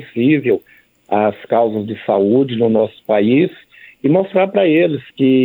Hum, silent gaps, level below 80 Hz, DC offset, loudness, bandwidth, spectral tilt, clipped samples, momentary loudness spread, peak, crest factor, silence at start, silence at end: none; none; -66 dBFS; under 0.1%; -15 LUFS; 4.2 kHz; -9.5 dB/octave; under 0.1%; 6 LU; -2 dBFS; 14 dB; 0 s; 0 s